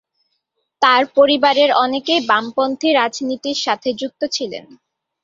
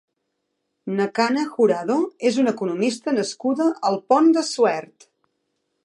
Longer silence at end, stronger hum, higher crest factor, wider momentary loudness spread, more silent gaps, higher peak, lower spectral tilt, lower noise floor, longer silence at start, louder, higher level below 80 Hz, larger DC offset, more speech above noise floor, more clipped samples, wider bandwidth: second, 0.6 s vs 1 s; neither; about the same, 16 dB vs 18 dB; first, 10 LU vs 7 LU; neither; first, 0 dBFS vs -4 dBFS; second, -2.5 dB/octave vs -5 dB/octave; second, -72 dBFS vs -76 dBFS; about the same, 0.8 s vs 0.85 s; first, -16 LUFS vs -21 LUFS; first, -64 dBFS vs -76 dBFS; neither; about the same, 55 dB vs 56 dB; neither; second, 7.6 kHz vs 11.5 kHz